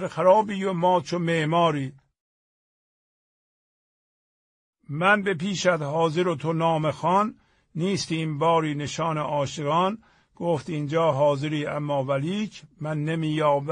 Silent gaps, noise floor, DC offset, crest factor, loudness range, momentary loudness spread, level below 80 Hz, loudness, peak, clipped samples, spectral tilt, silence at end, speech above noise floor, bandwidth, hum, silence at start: 2.21-4.73 s; under -90 dBFS; under 0.1%; 20 dB; 5 LU; 9 LU; -66 dBFS; -24 LUFS; -6 dBFS; under 0.1%; -6 dB/octave; 0 s; over 66 dB; 10.5 kHz; none; 0 s